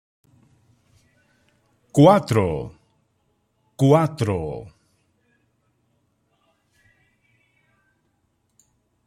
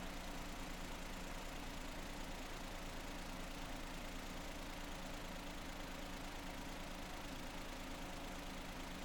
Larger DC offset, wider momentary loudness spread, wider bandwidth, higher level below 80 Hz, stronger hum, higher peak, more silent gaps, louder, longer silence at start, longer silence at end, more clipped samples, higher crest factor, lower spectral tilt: neither; first, 18 LU vs 0 LU; second, 14.5 kHz vs 18 kHz; about the same, -54 dBFS vs -52 dBFS; neither; first, -2 dBFS vs -34 dBFS; neither; first, -19 LUFS vs -49 LUFS; first, 1.95 s vs 0 s; first, 4.4 s vs 0 s; neither; first, 22 dB vs 14 dB; first, -7.5 dB/octave vs -3.5 dB/octave